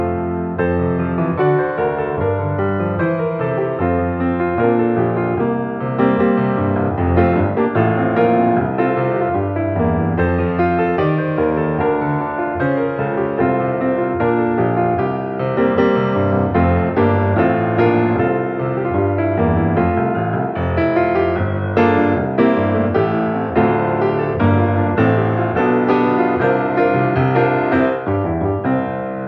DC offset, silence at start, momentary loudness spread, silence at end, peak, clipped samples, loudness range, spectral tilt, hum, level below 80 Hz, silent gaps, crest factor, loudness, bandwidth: under 0.1%; 0 s; 5 LU; 0 s; -2 dBFS; under 0.1%; 2 LU; -10.5 dB/octave; none; -40 dBFS; none; 14 dB; -17 LUFS; 5.8 kHz